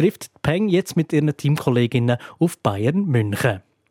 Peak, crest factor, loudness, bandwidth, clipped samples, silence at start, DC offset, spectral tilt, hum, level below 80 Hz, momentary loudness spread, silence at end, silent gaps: -4 dBFS; 16 dB; -21 LUFS; 16.5 kHz; under 0.1%; 0 s; under 0.1%; -7 dB/octave; none; -56 dBFS; 4 LU; 0.3 s; none